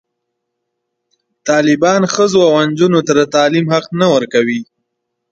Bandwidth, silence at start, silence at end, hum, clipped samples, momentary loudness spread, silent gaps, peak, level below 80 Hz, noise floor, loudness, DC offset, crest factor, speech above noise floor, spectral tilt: 9.2 kHz; 1.45 s; 0.7 s; none; under 0.1%; 5 LU; none; 0 dBFS; -58 dBFS; -73 dBFS; -12 LUFS; under 0.1%; 14 dB; 62 dB; -5 dB/octave